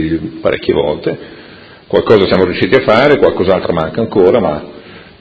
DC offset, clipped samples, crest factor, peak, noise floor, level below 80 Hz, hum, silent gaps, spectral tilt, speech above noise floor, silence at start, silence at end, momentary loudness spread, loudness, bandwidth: under 0.1%; 0.4%; 12 dB; 0 dBFS; -36 dBFS; -38 dBFS; none; none; -8 dB/octave; 25 dB; 0 s; 0.2 s; 11 LU; -12 LUFS; 8 kHz